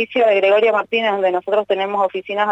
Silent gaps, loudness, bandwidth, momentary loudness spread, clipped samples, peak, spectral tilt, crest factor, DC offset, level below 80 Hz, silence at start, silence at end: none; -17 LUFS; 7.8 kHz; 7 LU; under 0.1%; -6 dBFS; -5.5 dB/octave; 10 dB; under 0.1%; -68 dBFS; 0 s; 0 s